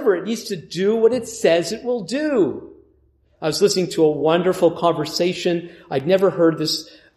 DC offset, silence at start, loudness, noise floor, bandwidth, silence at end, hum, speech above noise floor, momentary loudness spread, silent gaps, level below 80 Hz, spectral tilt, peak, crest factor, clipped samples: under 0.1%; 0 s; -20 LUFS; -59 dBFS; 15 kHz; 0.3 s; none; 40 dB; 9 LU; none; -60 dBFS; -5 dB/octave; -4 dBFS; 16 dB; under 0.1%